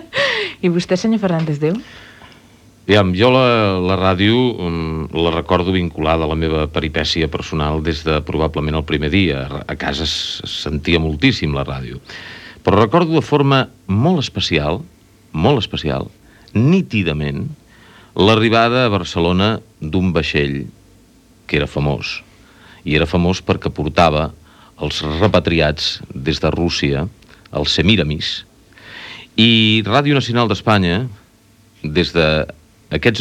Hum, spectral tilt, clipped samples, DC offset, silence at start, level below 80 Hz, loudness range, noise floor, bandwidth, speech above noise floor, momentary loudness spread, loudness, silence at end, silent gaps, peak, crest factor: none; -6 dB/octave; under 0.1%; under 0.1%; 0 s; -34 dBFS; 4 LU; -50 dBFS; 12.5 kHz; 34 dB; 13 LU; -16 LUFS; 0 s; none; 0 dBFS; 16 dB